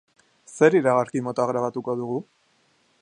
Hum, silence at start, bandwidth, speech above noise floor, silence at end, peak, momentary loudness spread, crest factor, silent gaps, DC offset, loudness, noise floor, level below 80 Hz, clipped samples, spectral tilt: none; 0.5 s; 10 kHz; 43 dB; 0.8 s; -4 dBFS; 13 LU; 22 dB; none; under 0.1%; -23 LUFS; -64 dBFS; -72 dBFS; under 0.1%; -6.5 dB/octave